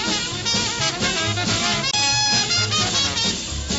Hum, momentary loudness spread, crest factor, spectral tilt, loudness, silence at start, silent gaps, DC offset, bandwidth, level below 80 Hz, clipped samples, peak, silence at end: none; 5 LU; 16 dB; -2 dB/octave; -19 LUFS; 0 s; none; under 0.1%; 8.2 kHz; -40 dBFS; under 0.1%; -6 dBFS; 0 s